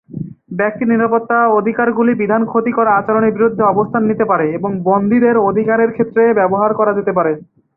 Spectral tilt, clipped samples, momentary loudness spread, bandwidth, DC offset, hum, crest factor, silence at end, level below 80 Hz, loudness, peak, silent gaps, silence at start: -12 dB/octave; under 0.1%; 6 LU; 3.1 kHz; under 0.1%; none; 12 dB; 0.35 s; -56 dBFS; -14 LUFS; -2 dBFS; none; 0.1 s